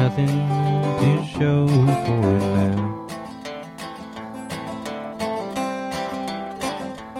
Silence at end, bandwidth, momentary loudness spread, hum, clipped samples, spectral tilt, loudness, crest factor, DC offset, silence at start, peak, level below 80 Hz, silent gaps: 0 s; 13.5 kHz; 15 LU; none; under 0.1%; -7 dB/octave; -22 LUFS; 16 dB; under 0.1%; 0 s; -6 dBFS; -50 dBFS; none